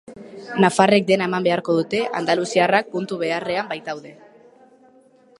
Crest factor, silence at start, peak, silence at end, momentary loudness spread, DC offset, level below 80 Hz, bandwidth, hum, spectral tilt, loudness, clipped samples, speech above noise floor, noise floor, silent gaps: 20 dB; 0.1 s; 0 dBFS; 1.25 s; 14 LU; under 0.1%; -66 dBFS; 11.5 kHz; none; -5 dB/octave; -20 LUFS; under 0.1%; 33 dB; -53 dBFS; none